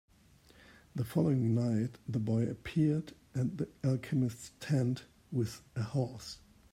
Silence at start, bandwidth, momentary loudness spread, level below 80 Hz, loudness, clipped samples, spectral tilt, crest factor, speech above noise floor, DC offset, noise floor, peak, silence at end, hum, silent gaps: 0.95 s; 16 kHz; 11 LU; -64 dBFS; -34 LUFS; under 0.1%; -7.5 dB/octave; 18 dB; 30 dB; under 0.1%; -63 dBFS; -16 dBFS; 0.4 s; none; none